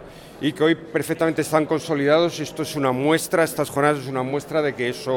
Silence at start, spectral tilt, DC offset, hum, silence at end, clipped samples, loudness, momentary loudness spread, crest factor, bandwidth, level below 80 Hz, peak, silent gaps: 0 s; -5 dB/octave; under 0.1%; none; 0 s; under 0.1%; -22 LUFS; 7 LU; 18 dB; 18.5 kHz; -58 dBFS; -4 dBFS; none